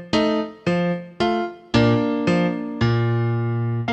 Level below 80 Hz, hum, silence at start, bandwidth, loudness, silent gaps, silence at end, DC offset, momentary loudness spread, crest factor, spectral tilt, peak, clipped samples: -46 dBFS; none; 0 s; 8.4 kHz; -21 LUFS; none; 0 s; under 0.1%; 5 LU; 14 dB; -7.5 dB/octave; -6 dBFS; under 0.1%